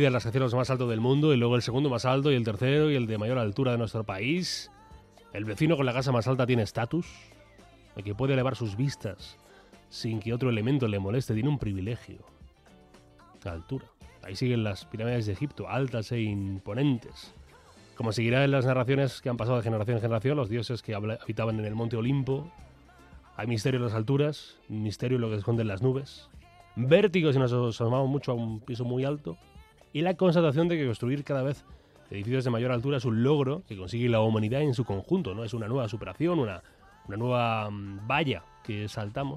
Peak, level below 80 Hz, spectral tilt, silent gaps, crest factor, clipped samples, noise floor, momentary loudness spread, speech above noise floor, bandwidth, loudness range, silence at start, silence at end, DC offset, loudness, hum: -8 dBFS; -58 dBFS; -7 dB/octave; none; 20 dB; under 0.1%; -56 dBFS; 14 LU; 28 dB; 12 kHz; 5 LU; 0 s; 0 s; under 0.1%; -28 LUFS; none